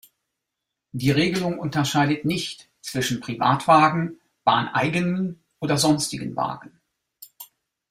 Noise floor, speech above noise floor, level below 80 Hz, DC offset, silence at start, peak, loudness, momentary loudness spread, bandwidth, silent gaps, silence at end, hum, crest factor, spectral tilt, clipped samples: -83 dBFS; 61 dB; -58 dBFS; under 0.1%; 0.95 s; -4 dBFS; -22 LUFS; 15 LU; 16 kHz; none; 0.45 s; none; 20 dB; -5 dB/octave; under 0.1%